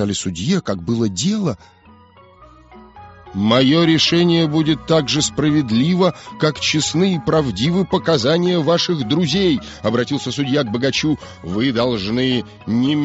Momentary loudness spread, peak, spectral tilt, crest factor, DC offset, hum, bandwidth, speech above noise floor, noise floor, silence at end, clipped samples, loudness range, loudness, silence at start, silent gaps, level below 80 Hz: 8 LU; -2 dBFS; -4.5 dB/octave; 16 dB; under 0.1%; none; 8 kHz; 29 dB; -46 dBFS; 0 s; under 0.1%; 4 LU; -17 LUFS; 0 s; none; -46 dBFS